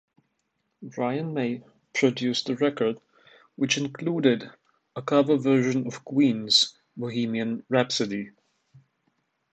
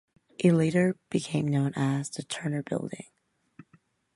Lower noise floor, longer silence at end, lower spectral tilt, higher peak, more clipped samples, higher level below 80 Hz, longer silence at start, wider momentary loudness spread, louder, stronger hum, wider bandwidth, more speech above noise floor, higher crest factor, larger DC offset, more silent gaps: first, -76 dBFS vs -64 dBFS; first, 0.75 s vs 0.55 s; second, -4.5 dB/octave vs -6.5 dB/octave; about the same, -6 dBFS vs -8 dBFS; neither; about the same, -72 dBFS vs -68 dBFS; first, 0.8 s vs 0.4 s; first, 15 LU vs 12 LU; first, -25 LUFS vs -28 LUFS; neither; second, 9 kHz vs 11.5 kHz; first, 52 dB vs 37 dB; about the same, 20 dB vs 20 dB; neither; neither